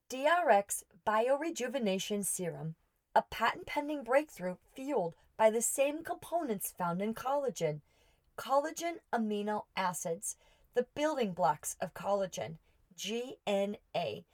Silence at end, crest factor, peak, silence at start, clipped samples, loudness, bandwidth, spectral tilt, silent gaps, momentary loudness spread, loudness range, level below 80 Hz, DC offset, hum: 0.1 s; 20 dB; -14 dBFS; 0.1 s; under 0.1%; -34 LUFS; over 20 kHz; -3.5 dB/octave; none; 11 LU; 3 LU; -70 dBFS; under 0.1%; none